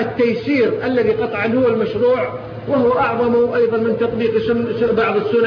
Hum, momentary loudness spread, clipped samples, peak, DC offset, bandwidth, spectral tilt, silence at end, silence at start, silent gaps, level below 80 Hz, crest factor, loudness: none; 3 LU; under 0.1%; -4 dBFS; under 0.1%; 5.4 kHz; -8.5 dB/octave; 0 s; 0 s; none; -48 dBFS; 12 dB; -17 LUFS